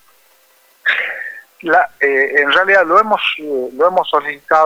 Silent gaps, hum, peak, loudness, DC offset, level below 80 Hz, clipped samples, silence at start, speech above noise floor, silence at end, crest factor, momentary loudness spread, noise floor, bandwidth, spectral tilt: none; none; -2 dBFS; -14 LUFS; under 0.1%; -60 dBFS; under 0.1%; 0.85 s; 39 dB; 0 s; 14 dB; 11 LU; -52 dBFS; over 20 kHz; -3.5 dB/octave